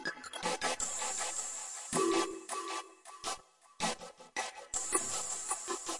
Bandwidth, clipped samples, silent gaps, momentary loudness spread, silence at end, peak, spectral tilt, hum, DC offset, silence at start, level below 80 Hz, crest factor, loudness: 11.5 kHz; under 0.1%; none; 10 LU; 0 s; -16 dBFS; -1.5 dB/octave; none; under 0.1%; 0 s; -66 dBFS; 22 dB; -36 LUFS